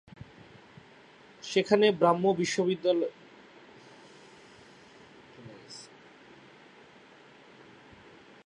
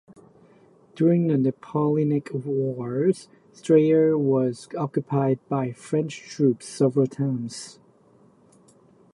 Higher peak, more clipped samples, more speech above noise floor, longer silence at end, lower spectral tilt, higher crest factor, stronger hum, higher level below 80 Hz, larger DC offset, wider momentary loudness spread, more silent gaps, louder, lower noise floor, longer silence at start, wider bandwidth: about the same, -8 dBFS vs -6 dBFS; neither; second, 30 dB vs 34 dB; first, 2.65 s vs 1.4 s; second, -5 dB/octave vs -8 dB/octave; first, 24 dB vs 18 dB; neither; about the same, -72 dBFS vs -70 dBFS; neither; first, 29 LU vs 11 LU; neither; second, -27 LUFS vs -24 LUFS; about the same, -55 dBFS vs -57 dBFS; first, 1.45 s vs 0.95 s; about the same, 10.5 kHz vs 11.5 kHz